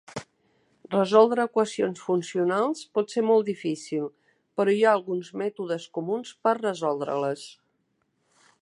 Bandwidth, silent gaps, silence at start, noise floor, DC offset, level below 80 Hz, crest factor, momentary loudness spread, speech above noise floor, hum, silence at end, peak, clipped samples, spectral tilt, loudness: 11 kHz; none; 0.1 s; -73 dBFS; under 0.1%; -76 dBFS; 20 dB; 11 LU; 48 dB; none; 1.15 s; -6 dBFS; under 0.1%; -5.5 dB/octave; -25 LUFS